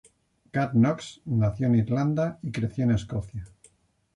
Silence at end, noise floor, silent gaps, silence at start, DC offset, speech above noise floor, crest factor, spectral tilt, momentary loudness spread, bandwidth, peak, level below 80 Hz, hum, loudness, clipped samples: 0.7 s; -64 dBFS; none; 0.55 s; under 0.1%; 39 dB; 14 dB; -8 dB/octave; 11 LU; 10.5 kHz; -12 dBFS; -50 dBFS; none; -26 LUFS; under 0.1%